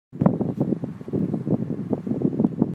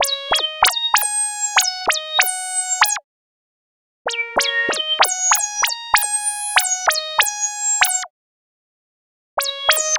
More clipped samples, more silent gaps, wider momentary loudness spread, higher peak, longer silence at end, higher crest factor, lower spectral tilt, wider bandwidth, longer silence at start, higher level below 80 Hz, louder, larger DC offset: neither; second, none vs 3.04-4.05 s, 8.10-9.37 s; about the same, 5 LU vs 7 LU; about the same, -2 dBFS vs 0 dBFS; about the same, 0 s vs 0 s; about the same, 22 dB vs 20 dB; first, -11.5 dB/octave vs 3 dB/octave; second, 4.5 kHz vs over 20 kHz; about the same, 0.1 s vs 0 s; about the same, -56 dBFS vs -56 dBFS; second, -25 LUFS vs -17 LUFS; neither